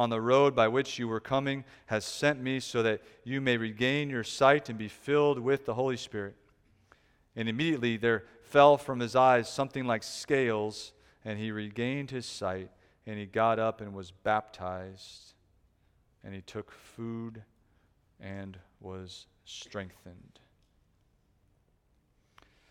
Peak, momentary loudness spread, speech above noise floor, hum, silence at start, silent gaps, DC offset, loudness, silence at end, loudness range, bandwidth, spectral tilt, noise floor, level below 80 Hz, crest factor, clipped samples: -6 dBFS; 21 LU; 40 dB; none; 0 s; none; under 0.1%; -29 LUFS; 2.55 s; 19 LU; 15 kHz; -5 dB/octave; -70 dBFS; -66 dBFS; 24 dB; under 0.1%